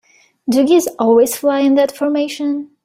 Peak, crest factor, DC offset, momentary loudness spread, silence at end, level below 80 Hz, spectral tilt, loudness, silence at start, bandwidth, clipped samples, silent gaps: -2 dBFS; 12 dB; under 0.1%; 8 LU; 0.2 s; -60 dBFS; -4 dB/octave; -15 LUFS; 0.45 s; 16.5 kHz; under 0.1%; none